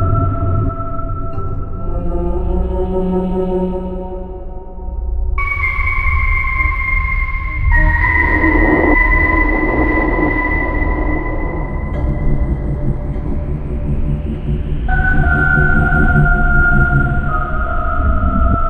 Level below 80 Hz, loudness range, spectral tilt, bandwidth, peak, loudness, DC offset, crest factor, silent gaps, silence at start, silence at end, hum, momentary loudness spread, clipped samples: -18 dBFS; 7 LU; -9.5 dB/octave; 4.4 kHz; 0 dBFS; -16 LUFS; under 0.1%; 14 dB; none; 0 s; 0 s; none; 12 LU; under 0.1%